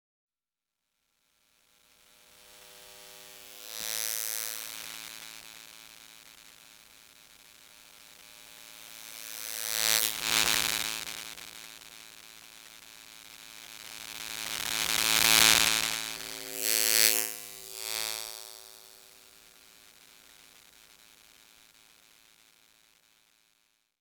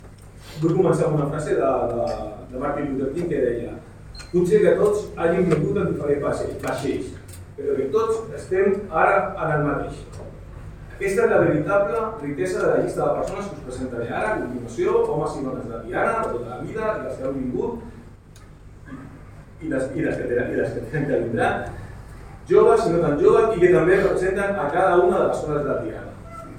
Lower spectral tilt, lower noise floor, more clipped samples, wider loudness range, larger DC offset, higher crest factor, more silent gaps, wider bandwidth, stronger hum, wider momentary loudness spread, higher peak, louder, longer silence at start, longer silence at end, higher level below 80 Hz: second, 1 dB/octave vs -7 dB/octave; first, under -90 dBFS vs -44 dBFS; neither; first, 23 LU vs 9 LU; neither; first, 34 dB vs 18 dB; neither; first, over 20 kHz vs 13.5 kHz; neither; first, 26 LU vs 20 LU; about the same, -2 dBFS vs -4 dBFS; second, -27 LUFS vs -22 LUFS; first, 2.5 s vs 0 s; first, 4.95 s vs 0 s; second, -64 dBFS vs -44 dBFS